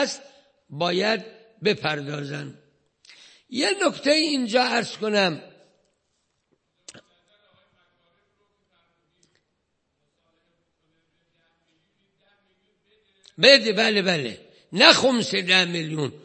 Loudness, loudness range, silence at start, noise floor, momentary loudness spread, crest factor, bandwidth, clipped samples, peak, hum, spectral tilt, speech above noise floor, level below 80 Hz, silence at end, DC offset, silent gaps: -20 LUFS; 10 LU; 0 s; -75 dBFS; 19 LU; 26 dB; 8.8 kHz; under 0.1%; 0 dBFS; none; -3.5 dB/octave; 53 dB; -72 dBFS; 0.1 s; under 0.1%; none